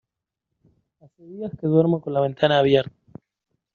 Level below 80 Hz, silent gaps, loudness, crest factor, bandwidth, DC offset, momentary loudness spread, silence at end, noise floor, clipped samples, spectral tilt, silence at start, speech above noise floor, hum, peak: -62 dBFS; none; -20 LUFS; 20 dB; 6.8 kHz; under 0.1%; 17 LU; 0.9 s; -83 dBFS; under 0.1%; -5 dB/octave; 1.3 s; 62 dB; none; -4 dBFS